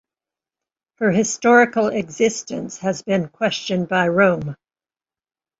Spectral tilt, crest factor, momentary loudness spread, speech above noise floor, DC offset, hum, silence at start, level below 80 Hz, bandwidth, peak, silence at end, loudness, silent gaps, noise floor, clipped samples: -4.5 dB/octave; 18 dB; 11 LU; over 71 dB; under 0.1%; none; 1 s; -58 dBFS; 8 kHz; -2 dBFS; 1.05 s; -19 LUFS; none; under -90 dBFS; under 0.1%